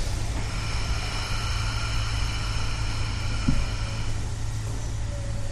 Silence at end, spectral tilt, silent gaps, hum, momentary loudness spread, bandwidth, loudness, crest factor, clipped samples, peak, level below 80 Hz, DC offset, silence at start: 0 s; -4.5 dB/octave; none; none; 4 LU; 12.5 kHz; -30 LUFS; 18 dB; under 0.1%; -8 dBFS; -30 dBFS; under 0.1%; 0 s